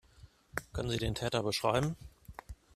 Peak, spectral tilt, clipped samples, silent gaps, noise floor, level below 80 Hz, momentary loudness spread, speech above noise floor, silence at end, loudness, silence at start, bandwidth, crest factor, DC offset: -14 dBFS; -5 dB/octave; under 0.1%; none; -60 dBFS; -52 dBFS; 20 LU; 26 dB; 0.2 s; -34 LUFS; 0.2 s; 14.5 kHz; 22 dB; under 0.1%